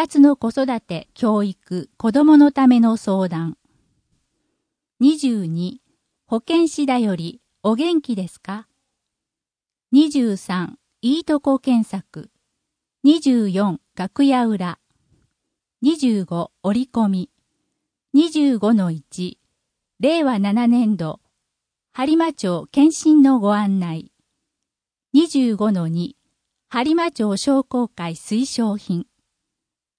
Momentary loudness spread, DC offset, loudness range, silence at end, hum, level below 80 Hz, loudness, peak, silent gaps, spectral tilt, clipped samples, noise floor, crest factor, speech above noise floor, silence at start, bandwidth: 15 LU; under 0.1%; 5 LU; 0.95 s; none; -62 dBFS; -19 LUFS; -2 dBFS; none; -6 dB/octave; under 0.1%; -90 dBFS; 16 dB; 72 dB; 0 s; 10.5 kHz